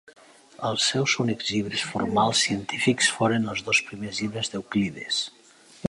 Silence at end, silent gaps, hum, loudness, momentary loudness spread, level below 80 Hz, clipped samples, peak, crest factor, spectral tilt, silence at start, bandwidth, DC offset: 0 s; none; none; -24 LUFS; 9 LU; -58 dBFS; under 0.1%; -8 dBFS; 18 dB; -3.5 dB/octave; 0.6 s; 11.5 kHz; under 0.1%